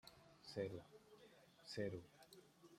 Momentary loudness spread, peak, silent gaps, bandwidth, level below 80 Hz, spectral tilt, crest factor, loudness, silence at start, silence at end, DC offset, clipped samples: 18 LU; -32 dBFS; none; 16 kHz; -82 dBFS; -5.5 dB/octave; 22 dB; -51 LUFS; 0.05 s; 0 s; under 0.1%; under 0.1%